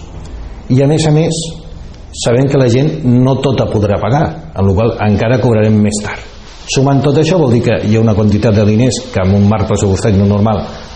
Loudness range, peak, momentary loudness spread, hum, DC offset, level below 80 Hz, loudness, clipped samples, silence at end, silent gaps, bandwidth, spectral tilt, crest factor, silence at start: 2 LU; 0 dBFS; 14 LU; none; under 0.1%; -32 dBFS; -11 LUFS; under 0.1%; 0 s; none; 9.4 kHz; -6.5 dB/octave; 10 dB; 0 s